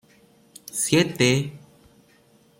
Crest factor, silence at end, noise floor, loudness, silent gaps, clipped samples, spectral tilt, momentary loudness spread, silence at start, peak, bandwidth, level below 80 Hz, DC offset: 20 dB; 1 s; -58 dBFS; -22 LUFS; none; under 0.1%; -4 dB/octave; 15 LU; 0.75 s; -6 dBFS; 16.5 kHz; -60 dBFS; under 0.1%